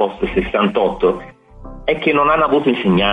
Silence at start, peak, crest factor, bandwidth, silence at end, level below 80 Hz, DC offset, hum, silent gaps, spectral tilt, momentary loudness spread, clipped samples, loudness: 0 s; -4 dBFS; 12 dB; 8.6 kHz; 0 s; -36 dBFS; under 0.1%; none; none; -7.5 dB/octave; 7 LU; under 0.1%; -16 LUFS